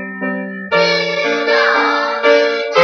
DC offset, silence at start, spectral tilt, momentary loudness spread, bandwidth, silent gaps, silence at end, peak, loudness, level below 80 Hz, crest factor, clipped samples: under 0.1%; 0 s; -4 dB/octave; 9 LU; 6.8 kHz; none; 0 s; 0 dBFS; -14 LUFS; -68 dBFS; 14 dB; under 0.1%